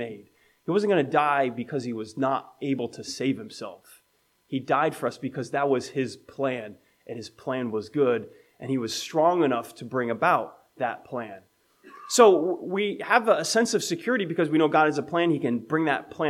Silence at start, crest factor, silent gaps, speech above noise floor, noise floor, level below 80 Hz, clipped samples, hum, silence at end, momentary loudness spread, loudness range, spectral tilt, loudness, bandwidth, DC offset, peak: 0 s; 22 dB; none; 43 dB; -68 dBFS; -74 dBFS; under 0.1%; none; 0 s; 14 LU; 7 LU; -4.5 dB/octave; -25 LUFS; 15.5 kHz; under 0.1%; -4 dBFS